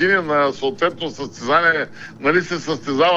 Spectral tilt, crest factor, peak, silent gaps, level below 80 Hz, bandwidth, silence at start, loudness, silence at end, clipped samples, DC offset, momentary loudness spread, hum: -4.5 dB/octave; 14 dB; -4 dBFS; none; -56 dBFS; 8 kHz; 0 s; -19 LUFS; 0 s; under 0.1%; under 0.1%; 12 LU; none